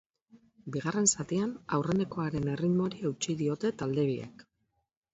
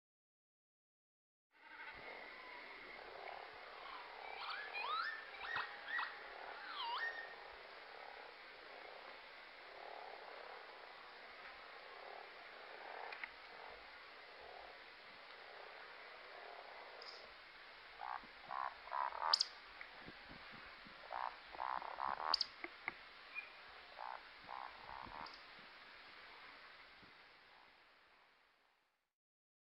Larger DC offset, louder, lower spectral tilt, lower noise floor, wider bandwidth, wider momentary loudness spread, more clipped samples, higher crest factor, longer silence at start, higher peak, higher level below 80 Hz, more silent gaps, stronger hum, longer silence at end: neither; first, -31 LUFS vs -48 LUFS; first, -5 dB/octave vs -1 dB/octave; about the same, -79 dBFS vs -81 dBFS; second, 8 kHz vs 16 kHz; second, 9 LU vs 14 LU; neither; second, 20 dB vs 32 dB; second, 0.35 s vs 1.55 s; first, -12 dBFS vs -20 dBFS; first, -62 dBFS vs -80 dBFS; neither; neither; second, 0.7 s vs 1.2 s